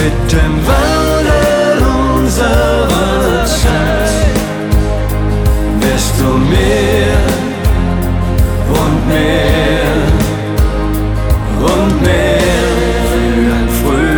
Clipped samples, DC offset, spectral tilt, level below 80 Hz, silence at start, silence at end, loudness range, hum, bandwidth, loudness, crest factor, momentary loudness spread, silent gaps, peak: under 0.1%; under 0.1%; -5.5 dB/octave; -16 dBFS; 0 s; 0 s; 1 LU; none; over 20 kHz; -12 LUFS; 10 dB; 4 LU; none; 0 dBFS